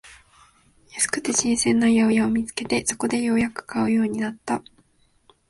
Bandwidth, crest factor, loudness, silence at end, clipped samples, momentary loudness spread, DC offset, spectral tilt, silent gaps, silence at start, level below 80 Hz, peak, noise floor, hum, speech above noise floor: 11.5 kHz; 18 dB; -22 LUFS; 0.9 s; under 0.1%; 10 LU; under 0.1%; -3.5 dB/octave; none; 0.05 s; -54 dBFS; -6 dBFS; -61 dBFS; none; 39 dB